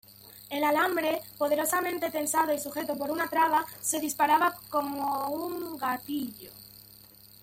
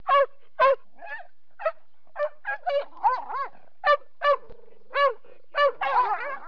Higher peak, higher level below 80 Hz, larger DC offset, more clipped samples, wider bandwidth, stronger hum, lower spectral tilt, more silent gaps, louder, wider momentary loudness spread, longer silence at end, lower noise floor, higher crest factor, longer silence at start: about the same, -12 dBFS vs -10 dBFS; about the same, -68 dBFS vs -66 dBFS; second, under 0.1% vs 1%; neither; first, 17 kHz vs 5.4 kHz; neither; about the same, -2.5 dB/octave vs -3 dB/octave; neither; second, -29 LUFS vs -26 LUFS; about the same, 16 LU vs 15 LU; first, 0.15 s vs 0 s; first, -53 dBFS vs -49 dBFS; about the same, 18 dB vs 16 dB; about the same, 0.1 s vs 0.05 s